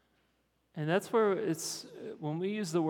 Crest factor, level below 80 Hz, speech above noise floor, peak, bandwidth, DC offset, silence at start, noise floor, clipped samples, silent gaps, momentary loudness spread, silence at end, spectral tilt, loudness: 18 dB; -82 dBFS; 43 dB; -16 dBFS; 18.5 kHz; under 0.1%; 0.75 s; -75 dBFS; under 0.1%; none; 12 LU; 0 s; -5 dB/octave; -33 LUFS